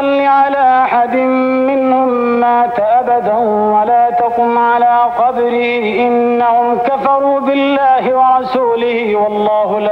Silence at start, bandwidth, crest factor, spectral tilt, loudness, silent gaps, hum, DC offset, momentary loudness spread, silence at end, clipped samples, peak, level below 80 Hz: 0 s; 5.6 kHz; 10 dB; -7 dB/octave; -12 LUFS; none; none; under 0.1%; 3 LU; 0 s; under 0.1%; -2 dBFS; -54 dBFS